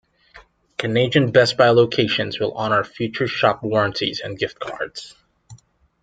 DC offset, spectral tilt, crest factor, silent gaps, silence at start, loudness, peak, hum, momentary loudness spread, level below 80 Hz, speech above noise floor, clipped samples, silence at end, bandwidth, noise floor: under 0.1%; -5.5 dB/octave; 20 dB; none; 0.35 s; -19 LUFS; 0 dBFS; none; 14 LU; -58 dBFS; 30 dB; under 0.1%; 0.45 s; 9.2 kHz; -49 dBFS